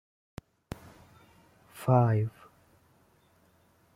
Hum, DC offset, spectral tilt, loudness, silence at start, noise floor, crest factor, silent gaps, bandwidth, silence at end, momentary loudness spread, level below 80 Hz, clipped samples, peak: none; under 0.1%; -8.5 dB/octave; -27 LUFS; 1.75 s; -65 dBFS; 24 dB; none; 15 kHz; 1.65 s; 26 LU; -62 dBFS; under 0.1%; -10 dBFS